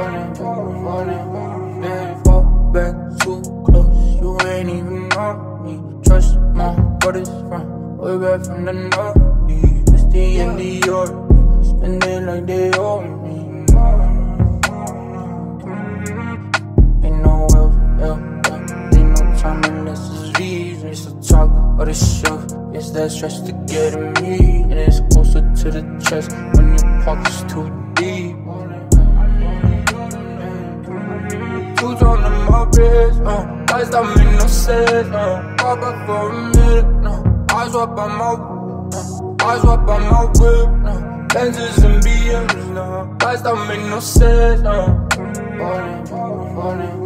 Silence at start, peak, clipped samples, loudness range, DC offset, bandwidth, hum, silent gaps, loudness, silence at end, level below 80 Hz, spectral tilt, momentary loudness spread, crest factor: 0 s; 0 dBFS; under 0.1%; 3 LU; under 0.1%; 14.5 kHz; none; none; -17 LUFS; 0 s; -14 dBFS; -6 dB/octave; 12 LU; 14 dB